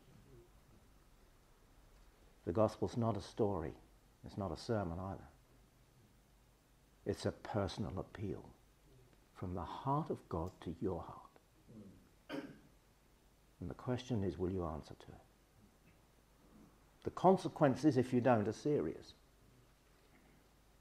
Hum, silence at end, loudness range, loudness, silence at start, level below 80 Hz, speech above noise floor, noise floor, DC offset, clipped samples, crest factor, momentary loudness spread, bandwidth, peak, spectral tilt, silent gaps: none; 1.7 s; 11 LU; -39 LUFS; 0.3 s; -66 dBFS; 31 dB; -69 dBFS; under 0.1%; under 0.1%; 24 dB; 23 LU; 15 kHz; -16 dBFS; -7.5 dB/octave; none